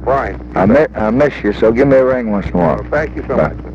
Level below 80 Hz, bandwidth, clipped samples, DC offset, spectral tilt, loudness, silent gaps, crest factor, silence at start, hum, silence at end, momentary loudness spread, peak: -30 dBFS; 7.4 kHz; under 0.1%; under 0.1%; -8.5 dB/octave; -14 LUFS; none; 12 dB; 0 s; none; 0 s; 7 LU; 0 dBFS